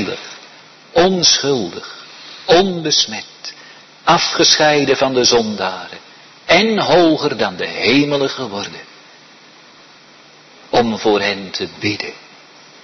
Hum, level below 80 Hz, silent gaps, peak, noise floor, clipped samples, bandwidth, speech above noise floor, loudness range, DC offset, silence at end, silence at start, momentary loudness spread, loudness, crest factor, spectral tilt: none; -50 dBFS; none; 0 dBFS; -44 dBFS; under 0.1%; 6.4 kHz; 29 dB; 7 LU; under 0.1%; 0.65 s; 0 s; 20 LU; -14 LUFS; 18 dB; -3 dB/octave